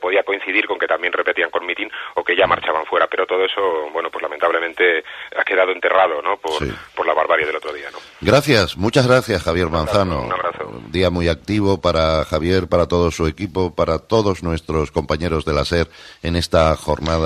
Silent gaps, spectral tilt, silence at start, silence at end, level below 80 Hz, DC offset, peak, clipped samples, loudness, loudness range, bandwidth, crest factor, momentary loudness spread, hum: none; -5.5 dB/octave; 0 s; 0 s; -36 dBFS; under 0.1%; 0 dBFS; under 0.1%; -18 LUFS; 2 LU; 14.5 kHz; 18 dB; 8 LU; none